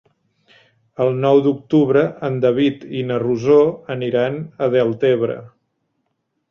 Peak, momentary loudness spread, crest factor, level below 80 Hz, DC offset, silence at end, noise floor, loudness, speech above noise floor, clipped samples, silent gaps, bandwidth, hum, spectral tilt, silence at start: -2 dBFS; 9 LU; 16 dB; -60 dBFS; under 0.1%; 1.05 s; -72 dBFS; -18 LUFS; 55 dB; under 0.1%; none; 6.8 kHz; none; -8 dB/octave; 1 s